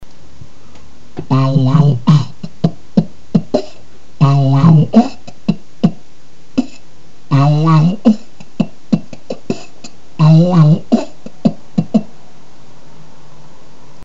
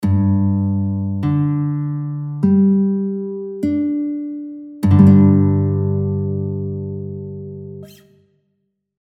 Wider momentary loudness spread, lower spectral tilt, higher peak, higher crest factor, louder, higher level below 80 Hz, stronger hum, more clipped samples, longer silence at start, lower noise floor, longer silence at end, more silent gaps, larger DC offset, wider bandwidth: second, 15 LU vs 18 LU; second, -8.5 dB/octave vs -11 dB/octave; about the same, 0 dBFS vs 0 dBFS; about the same, 14 dB vs 18 dB; first, -13 LUFS vs -17 LUFS; about the same, -48 dBFS vs -50 dBFS; neither; neither; about the same, 0 s vs 0 s; second, -46 dBFS vs -70 dBFS; first, 2 s vs 1.15 s; neither; first, 7% vs under 0.1%; first, 7.6 kHz vs 4.7 kHz